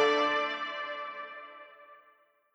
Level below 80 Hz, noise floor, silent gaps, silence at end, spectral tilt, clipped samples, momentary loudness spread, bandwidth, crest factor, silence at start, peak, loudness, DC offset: under -90 dBFS; -65 dBFS; none; 0.6 s; -2 dB/octave; under 0.1%; 24 LU; 8.6 kHz; 20 dB; 0 s; -14 dBFS; -32 LUFS; under 0.1%